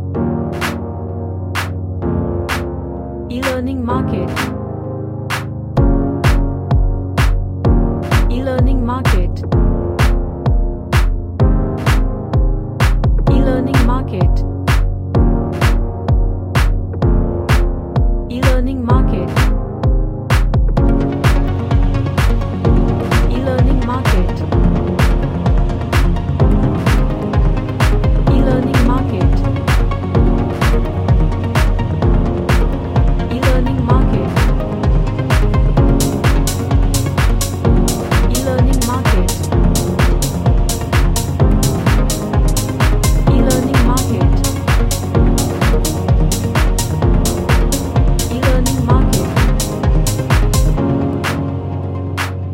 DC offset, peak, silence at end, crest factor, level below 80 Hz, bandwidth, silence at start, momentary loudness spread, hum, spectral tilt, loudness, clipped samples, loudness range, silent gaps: under 0.1%; 0 dBFS; 0 s; 12 dB; -16 dBFS; 16.5 kHz; 0 s; 5 LU; none; -6 dB/octave; -16 LUFS; under 0.1%; 2 LU; none